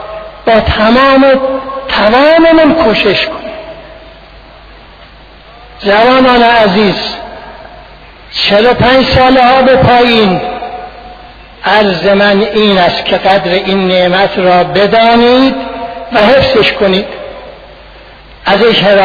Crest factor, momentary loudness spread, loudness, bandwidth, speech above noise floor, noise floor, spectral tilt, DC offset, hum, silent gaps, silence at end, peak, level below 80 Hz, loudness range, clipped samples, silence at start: 8 dB; 16 LU; -7 LUFS; 5.4 kHz; 28 dB; -34 dBFS; -6.5 dB/octave; under 0.1%; none; none; 0 s; 0 dBFS; -32 dBFS; 3 LU; 0.3%; 0 s